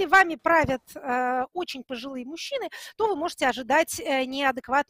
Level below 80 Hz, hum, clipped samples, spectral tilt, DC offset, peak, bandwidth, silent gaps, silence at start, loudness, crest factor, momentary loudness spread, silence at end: -54 dBFS; none; under 0.1%; -3 dB/octave; under 0.1%; -6 dBFS; 16 kHz; none; 0 s; -25 LUFS; 18 dB; 13 LU; 0.05 s